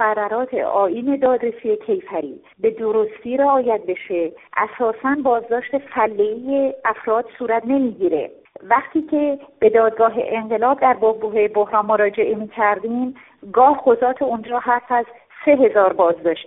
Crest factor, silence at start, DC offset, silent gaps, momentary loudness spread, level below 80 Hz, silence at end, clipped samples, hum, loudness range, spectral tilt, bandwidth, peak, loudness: 18 dB; 0 s; under 0.1%; none; 8 LU; -62 dBFS; 0.05 s; under 0.1%; none; 3 LU; 0.5 dB/octave; 3.9 kHz; -2 dBFS; -19 LUFS